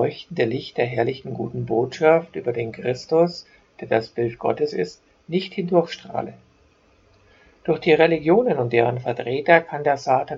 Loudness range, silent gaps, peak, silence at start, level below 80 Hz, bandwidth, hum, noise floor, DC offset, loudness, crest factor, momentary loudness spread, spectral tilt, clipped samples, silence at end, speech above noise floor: 6 LU; none; 0 dBFS; 0 s; -60 dBFS; 7.6 kHz; none; -58 dBFS; under 0.1%; -22 LUFS; 22 dB; 12 LU; -7 dB/octave; under 0.1%; 0 s; 36 dB